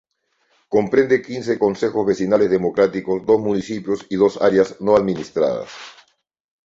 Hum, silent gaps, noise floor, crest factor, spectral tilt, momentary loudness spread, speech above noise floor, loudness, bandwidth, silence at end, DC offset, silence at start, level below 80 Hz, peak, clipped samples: none; none; -66 dBFS; 18 dB; -6.5 dB/octave; 8 LU; 48 dB; -19 LUFS; 7.8 kHz; 0.75 s; under 0.1%; 0.7 s; -56 dBFS; -2 dBFS; under 0.1%